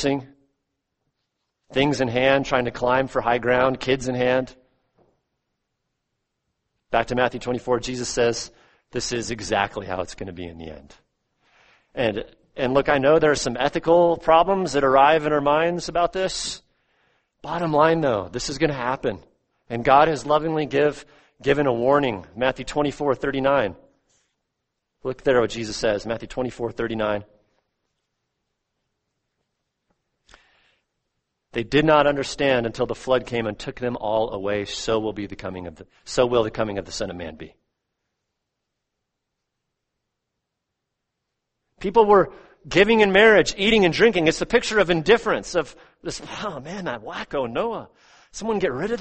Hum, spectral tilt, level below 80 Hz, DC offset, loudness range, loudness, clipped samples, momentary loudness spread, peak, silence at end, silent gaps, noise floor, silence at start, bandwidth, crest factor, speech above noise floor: none; -4.5 dB/octave; -48 dBFS; under 0.1%; 11 LU; -21 LUFS; under 0.1%; 15 LU; -2 dBFS; 0 s; none; -81 dBFS; 0 s; 8.8 kHz; 22 dB; 60 dB